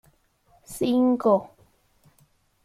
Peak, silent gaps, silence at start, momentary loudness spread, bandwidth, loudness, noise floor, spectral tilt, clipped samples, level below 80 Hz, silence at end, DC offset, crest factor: -8 dBFS; none; 0.7 s; 10 LU; 14.5 kHz; -23 LUFS; -63 dBFS; -6.5 dB/octave; under 0.1%; -62 dBFS; 1.2 s; under 0.1%; 18 dB